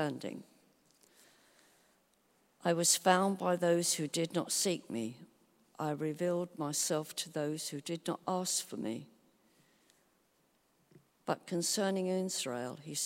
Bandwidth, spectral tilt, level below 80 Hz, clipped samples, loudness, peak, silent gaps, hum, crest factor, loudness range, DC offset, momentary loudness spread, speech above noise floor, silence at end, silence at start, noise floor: 16 kHz; -3.5 dB/octave; -84 dBFS; under 0.1%; -34 LUFS; -12 dBFS; none; none; 24 dB; 9 LU; under 0.1%; 12 LU; 39 dB; 0 s; 0 s; -73 dBFS